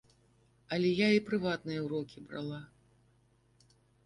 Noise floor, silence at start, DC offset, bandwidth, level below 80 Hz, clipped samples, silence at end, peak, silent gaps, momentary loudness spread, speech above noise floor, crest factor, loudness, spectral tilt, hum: -69 dBFS; 0.7 s; under 0.1%; 11 kHz; -70 dBFS; under 0.1%; 1.4 s; -16 dBFS; none; 14 LU; 36 dB; 20 dB; -33 LUFS; -6.5 dB/octave; none